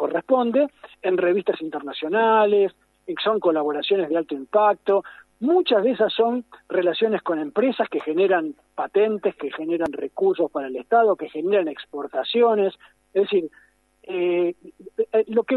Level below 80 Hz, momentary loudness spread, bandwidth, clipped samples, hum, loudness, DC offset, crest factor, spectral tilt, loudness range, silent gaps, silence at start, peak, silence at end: -70 dBFS; 10 LU; 4.5 kHz; under 0.1%; none; -22 LUFS; under 0.1%; 16 dB; -7 dB/octave; 2 LU; none; 0 s; -6 dBFS; 0 s